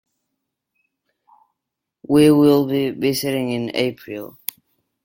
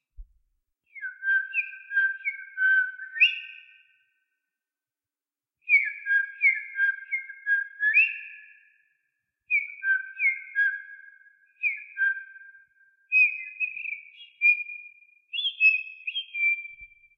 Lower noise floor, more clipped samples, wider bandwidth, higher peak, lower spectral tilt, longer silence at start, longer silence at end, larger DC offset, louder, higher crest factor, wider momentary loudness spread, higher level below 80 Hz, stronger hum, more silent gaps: second, -82 dBFS vs under -90 dBFS; neither; first, 17 kHz vs 6 kHz; first, 0 dBFS vs -10 dBFS; first, -6 dB/octave vs 2.5 dB/octave; first, 2.1 s vs 0.2 s; first, 0.75 s vs 0.3 s; neither; first, -18 LUFS vs -24 LUFS; about the same, 20 dB vs 20 dB; about the same, 18 LU vs 17 LU; about the same, -60 dBFS vs -64 dBFS; neither; neither